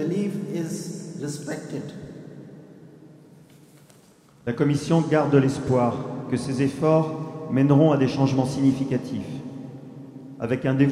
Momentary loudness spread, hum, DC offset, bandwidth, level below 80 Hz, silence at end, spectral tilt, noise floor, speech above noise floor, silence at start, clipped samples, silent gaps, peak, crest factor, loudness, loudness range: 20 LU; none; under 0.1%; 12.5 kHz; -60 dBFS; 0 s; -7.5 dB/octave; -54 dBFS; 32 dB; 0 s; under 0.1%; none; -6 dBFS; 18 dB; -23 LUFS; 15 LU